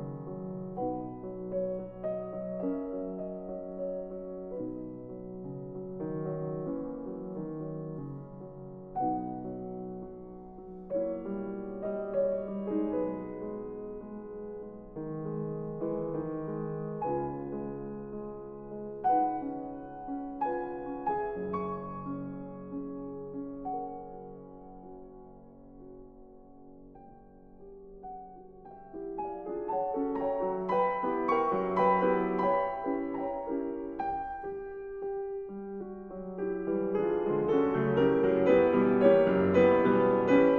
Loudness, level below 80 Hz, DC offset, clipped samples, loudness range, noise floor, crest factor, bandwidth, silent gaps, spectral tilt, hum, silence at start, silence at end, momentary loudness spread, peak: -32 LUFS; -58 dBFS; under 0.1%; under 0.1%; 14 LU; -53 dBFS; 22 dB; 7 kHz; none; -9.5 dB/octave; none; 0 s; 0 s; 20 LU; -10 dBFS